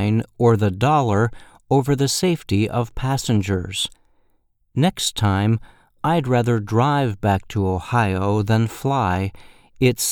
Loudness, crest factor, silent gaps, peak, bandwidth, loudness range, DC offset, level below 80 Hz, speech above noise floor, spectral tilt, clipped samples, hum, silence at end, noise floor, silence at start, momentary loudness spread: -20 LUFS; 16 dB; none; -4 dBFS; 19 kHz; 3 LU; under 0.1%; -44 dBFS; 43 dB; -5.5 dB/octave; under 0.1%; none; 0 s; -62 dBFS; 0 s; 6 LU